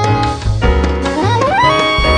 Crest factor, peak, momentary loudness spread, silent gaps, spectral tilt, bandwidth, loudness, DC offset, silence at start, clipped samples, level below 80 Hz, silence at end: 12 dB; 0 dBFS; 5 LU; none; -5.5 dB/octave; 10 kHz; -13 LUFS; under 0.1%; 0 s; under 0.1%; -20 dBFS; 0 s